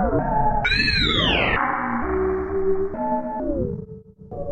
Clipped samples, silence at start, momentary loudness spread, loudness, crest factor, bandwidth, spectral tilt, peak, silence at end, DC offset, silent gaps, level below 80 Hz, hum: under 0.1%; 0 s; 11 LU; -21 LUFS; 18 dB; 9 kHz; -6 dB/octave; -4 dBFS; 0 s; under 0.1%; none; -32 dBFS; none